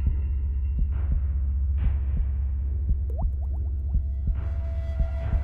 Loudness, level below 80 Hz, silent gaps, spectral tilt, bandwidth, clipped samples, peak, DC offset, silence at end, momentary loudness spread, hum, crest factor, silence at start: -28 LUFS; -26 dBFS; none; -10.5 dB/octave; 2.9 kHz; under 0.1%; -12 dBFS; under 0.1%; 0 s; 3 LU; none; 12 dB; 0 s